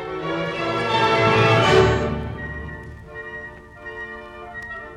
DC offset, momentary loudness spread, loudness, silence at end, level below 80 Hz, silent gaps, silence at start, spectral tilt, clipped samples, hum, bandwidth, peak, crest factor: under 0.1%; 20 LU; -19 LUFS; 0 s; -38 dBFS; none; 0 s; -5.5 dB/octave; under 0.1%; none; 11.5 kHz; -2 dBFS; 18 dB